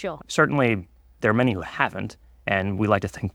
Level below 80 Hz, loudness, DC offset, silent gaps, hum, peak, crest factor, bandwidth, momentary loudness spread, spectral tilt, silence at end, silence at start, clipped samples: -52 dBFS; -23 LUFS; under 0.1%; none; none; -2 dBFS; 22 dB; 15.5 kHz; 10 LU; -6 dB/octave; 0.05 s; 0 s; under 0.1%